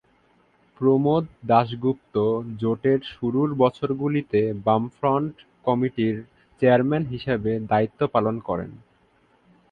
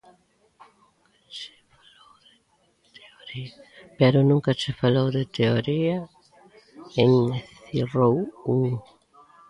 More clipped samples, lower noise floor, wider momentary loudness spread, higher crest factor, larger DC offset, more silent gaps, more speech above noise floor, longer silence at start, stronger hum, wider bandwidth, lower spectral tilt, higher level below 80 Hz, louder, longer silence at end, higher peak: neither; second, -61 dBFS vs -65 dBFS; second, 7 LU vs 19 LU; about the same, 20 dB vs 22 dB; neither; neither; second, 39 dB vs 43 dB; second, 0.8 s vs 1.3 s; neither; second, 5 kHz vs 10.5 kHz; first, -9.5 dB/octave vs -7.5 dB/octave; about the same, -56 dBFS vs -58 dBFS; about the same, -23 LUFS vs -23 LUFS; first, 0.95 s vs 0.7 s; about the same, -4 dBFS vs -4 dBFS